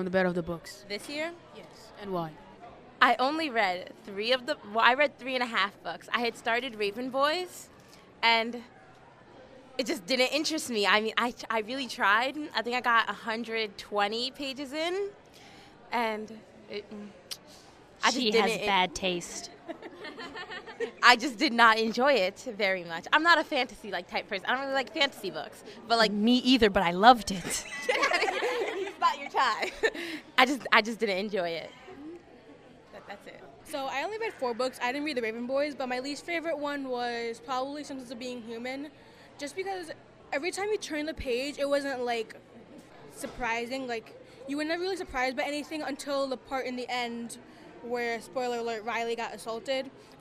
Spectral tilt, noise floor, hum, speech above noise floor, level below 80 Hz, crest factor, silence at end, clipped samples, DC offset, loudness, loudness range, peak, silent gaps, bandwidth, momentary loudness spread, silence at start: -3 dB/octave; -54 dBFS; none; 25 dB; -60 dBFS; 28 dB; 0.05 s; under 0.1%; under 0.1%; -29 LUFS; 10 LU; -2 dBFS; none; 15.5 kHz; 18 LU; 0 s